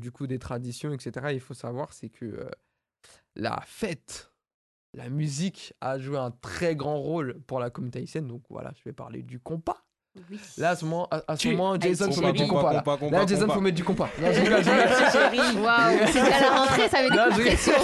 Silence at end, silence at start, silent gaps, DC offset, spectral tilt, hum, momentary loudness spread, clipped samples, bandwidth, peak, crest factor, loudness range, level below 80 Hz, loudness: 0 s; 0 s; 4.54-4.93 s; under 0.1%; -4.5 dB/octave; none; 20 LU; under 0.1%; 12.5 kHz; -6 dBFS; 20 dB; 16 LU; -48 dBFS; -24 LUFS